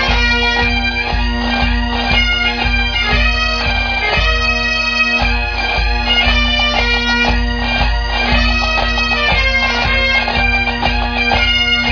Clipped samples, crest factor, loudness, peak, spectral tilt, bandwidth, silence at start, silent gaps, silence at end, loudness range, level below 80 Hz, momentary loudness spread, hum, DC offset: under 0.1%; 14 dB; -13 LUFS; 0 dBFS; -4 dB/octave; 5.4 kHz; 0 s; none; 0 s; 1 LU; -20 dBFS; 4 LU; none; under 0.1%